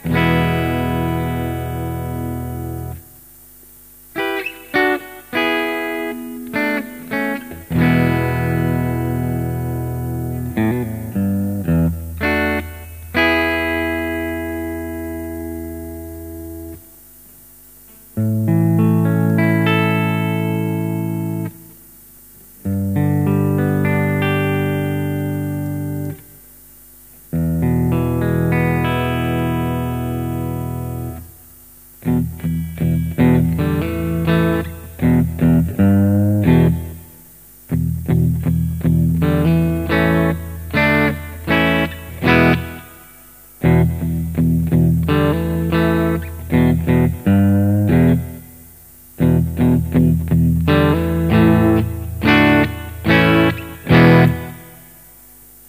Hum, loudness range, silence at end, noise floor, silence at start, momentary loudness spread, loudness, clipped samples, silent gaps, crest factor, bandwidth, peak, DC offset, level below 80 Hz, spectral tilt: 50 Hz at -45 dBFS; 8 LU; 0.9 s; -43 dBFS; 0 s; 13 LU; -17 LUFS; under 0.1%; none; 18 dB; 15.5 kHz; 0 dBFS; 0.1%; -34 dBFS; -7.5 dB/octave